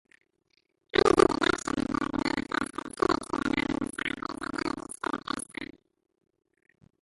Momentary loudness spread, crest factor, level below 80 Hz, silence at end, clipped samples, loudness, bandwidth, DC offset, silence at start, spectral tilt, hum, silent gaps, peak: 13 LU; 26 dB; -52 dBFS; 1.35 s; under 0.1%; -29 LUFS; 11.5 kHz; under 0.1%; 0.95 s; -4 dB/octave; none; none; -4 dBFS